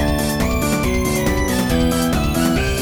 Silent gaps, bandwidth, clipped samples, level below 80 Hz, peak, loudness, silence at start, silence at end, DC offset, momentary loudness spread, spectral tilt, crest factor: none; over 20 kHz; under 0.1%; -24 dBFS; -4 dBFS; -18 LUFS; 0 s; 0 s; under 0.1%; 2 LU; -5 dB/octave; 12 dB